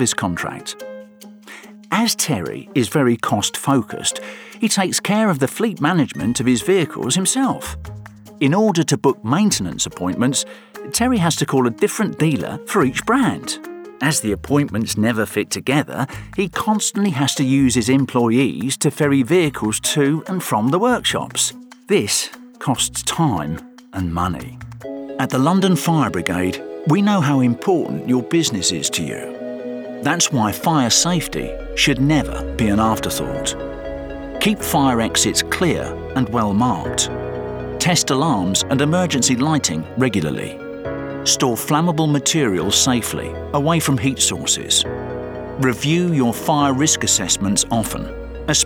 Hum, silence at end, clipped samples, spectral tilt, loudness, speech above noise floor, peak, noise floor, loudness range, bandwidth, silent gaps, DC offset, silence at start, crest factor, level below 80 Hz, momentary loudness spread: none; 0 s; under 0.1%; -4 dB/octave; -18 LUFS; 22 dB; -2 dBFS; -41 dBFS; 3 LU; over 20 kHz; none; under 0.1%; 0 s; 16 dB; -42 dBFS; 12 LU